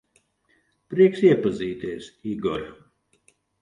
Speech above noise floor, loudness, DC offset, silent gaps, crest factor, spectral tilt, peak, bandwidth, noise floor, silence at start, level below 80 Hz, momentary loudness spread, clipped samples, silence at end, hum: 45 dB; -23 LUFS; under 0.1%; none; 20 dB; -7.5 dB/octave; -4 dBFS; 9.8 kHz; -67 dBFS; 0.9 s; -58 dBFS; 17 LU; under 0.1%; 0.85 s; none